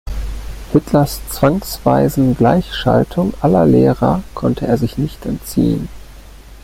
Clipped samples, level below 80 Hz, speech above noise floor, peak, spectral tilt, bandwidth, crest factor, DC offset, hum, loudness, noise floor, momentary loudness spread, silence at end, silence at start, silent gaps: under 0.1%; -30 dBFS; 22 dB; -2 dBFS; -7 dB/octave; 16.5 kHz; 14 dB; under 0.1%; none; -15 LUFS; -37 dBFS; 11 LU; 0.05 s; 0.05 s; none